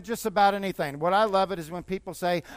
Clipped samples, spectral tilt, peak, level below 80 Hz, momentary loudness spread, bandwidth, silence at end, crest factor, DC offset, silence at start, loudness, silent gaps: under 0.1%; -5 dB/octave; -10 dBFS; -56 dBFS; 11 LU; 15.5 kHz; 0 s; 16 dB; under 0.1%; 0 s; -26 LUFS; none